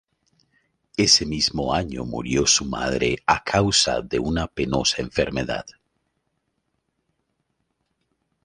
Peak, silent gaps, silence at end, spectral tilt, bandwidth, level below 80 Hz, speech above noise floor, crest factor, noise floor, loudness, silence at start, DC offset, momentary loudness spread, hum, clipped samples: -2 dBFS; none; 2.75 s; -3 dB/octave; 11.5 kHz; -42 dBFS; 52 dB; 22 dB; -74 dBFS; -21 LUFS; 1 s; under 0.1%; 11 LU; none; under 0.1%